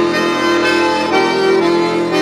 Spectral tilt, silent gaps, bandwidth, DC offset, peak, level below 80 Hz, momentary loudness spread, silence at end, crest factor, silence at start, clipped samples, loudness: -4.5 dB/octave; none; 13 kHz; under 0.1%; -2 dBFS; -56 dBFS; 2 LU; 0 s; 12 dB; 0 s; under 0.1%; -13 LUFS